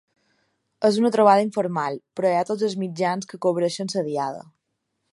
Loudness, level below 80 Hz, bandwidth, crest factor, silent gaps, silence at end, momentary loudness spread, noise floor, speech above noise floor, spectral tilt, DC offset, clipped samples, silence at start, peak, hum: -22 LUFS; -74 dBFS; 11.5 kHz; 20 dB; none; 0.7 s; 10 LU; -77 dBFS; 55 dB; -5.5 dB/octave; under 0.1%; under 0.1%; 0.8 s; -2 dBFS; none